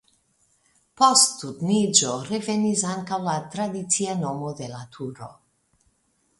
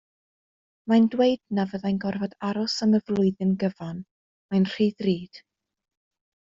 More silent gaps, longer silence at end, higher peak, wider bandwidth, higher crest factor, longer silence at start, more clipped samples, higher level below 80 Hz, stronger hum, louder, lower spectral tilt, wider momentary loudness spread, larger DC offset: second, none vs 4.11-4.49 s; about the same, 1.1 s vs 1.15 s; first, -2 dBFS vs -10 dBFS; first, 12 kHz vs 7.6 kHz; first, 24 dB vs 16 dB; first, 1 s vs 0.85 s; neither; about the same, -66 dBFS vs -64 dBFS; neither; first, -22 LUFS vs -25 LUFS; second, -3 dB/octave vs -7 dB/octave; first, 18 LU vs 12 LU; neither